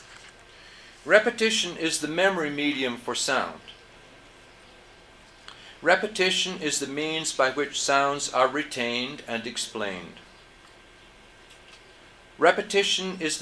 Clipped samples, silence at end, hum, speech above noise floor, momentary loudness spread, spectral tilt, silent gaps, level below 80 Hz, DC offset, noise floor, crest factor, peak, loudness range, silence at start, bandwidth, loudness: under 0.1%; 0 s; none; 26 dB; 22 LU; -2 dB/octave; none; -62 dBFS; under 0.1%; -52 dBFS; 24 dB; -4 dBFS; 8 LU; 0 s; 11 kHz; -25 LUFS